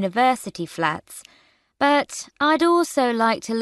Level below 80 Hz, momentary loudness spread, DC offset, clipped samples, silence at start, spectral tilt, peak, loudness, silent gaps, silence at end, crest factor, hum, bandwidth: -64 dBFS; 13 LU; under 0.1%; under 0.1%; 0 s; -4 dB/octave; -6 dBFS; -21 LUFS; none; 0 s; 16 dB; none; 12.5 kHz